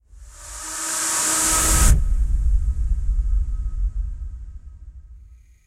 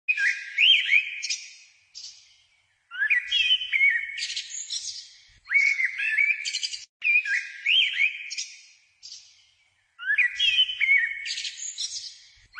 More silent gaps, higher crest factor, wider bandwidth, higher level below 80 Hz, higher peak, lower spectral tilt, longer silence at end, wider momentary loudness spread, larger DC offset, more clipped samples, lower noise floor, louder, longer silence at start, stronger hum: second, none vs 6.89-7.00 s; about the same, 18 dB vs 18 dB; first, 16 kHz vs 10.5 kHz; first, -22 dBFS vs -72 dBFS; first, -2 dBFS vs -8 dBFS; first, -2.5 dB/octave vs 6.5 dB/octave; first, 0.3 s vs 0 s; about the same, 20 LU vs 18 LU; neither; neither; second, -46 dBFS vs -66 dBFS; about the same, -21 LUFS vs -22 LUFS; about the same, 0.15 s vs 0.1 s; neither